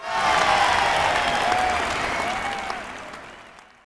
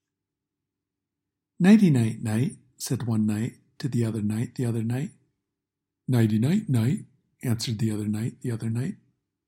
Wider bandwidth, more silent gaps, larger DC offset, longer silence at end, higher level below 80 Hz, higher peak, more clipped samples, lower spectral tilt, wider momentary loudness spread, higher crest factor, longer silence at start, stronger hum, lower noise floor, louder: second, 11 kHz vs 16.5 kHz; neither; neither; second, 0.25 s vs 0.5 s; first, -46 dBFS vs -64 dBFS; about the same, -6 dBFS vs -6 dBFS; neither; second, -2 dB/octave vs -7 dB/octave; first, 18 LU vs 13 LU; about the same, 18 dB vs 20 dB; second, 0 s vs 1.6 s; neither; second, -46 dBFS vs -86 dBFS; first, -21 LUFS vs -26 LUFS